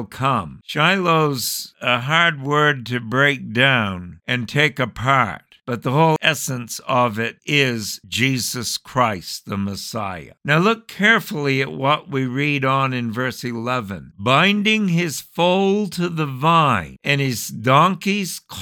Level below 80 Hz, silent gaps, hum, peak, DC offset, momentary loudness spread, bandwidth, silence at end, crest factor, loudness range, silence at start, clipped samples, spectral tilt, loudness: -56 dBFS; none; none; 0 dBFS; under 0.1%; 10 LU; 19 kHz; 0 s; 18 dB; 3 LU; 0 s; under 0.1%; -4.5 dB/octave; -19 LUFS